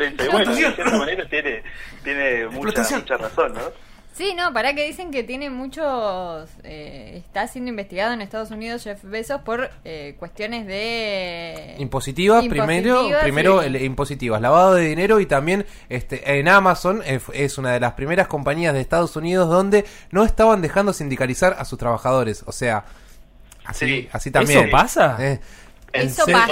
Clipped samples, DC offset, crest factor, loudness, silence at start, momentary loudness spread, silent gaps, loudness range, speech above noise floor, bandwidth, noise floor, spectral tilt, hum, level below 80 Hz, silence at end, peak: under 0.1%; under 0.1%; 18 dB; -19 LUFS; 0 s; 15 LU; none; 10 LU; 25 dB; 16 kHz; -45 dBFS; -5 dB/octave; none; -38 dBFS; 0 s; -2 dBFS